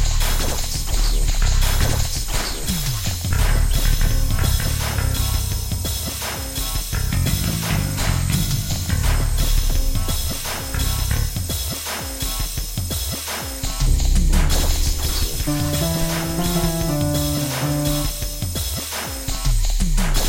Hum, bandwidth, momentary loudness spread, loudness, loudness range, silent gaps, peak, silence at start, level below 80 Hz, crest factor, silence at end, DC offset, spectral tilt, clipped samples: none; 16 kHz; 5 LU; -22 LUFS; 2 LU; none; -4 dBFS; 0 s; -22 dBFS; 16 dB; 0 s; 0.1%; -4 dB/octave; under 0.1%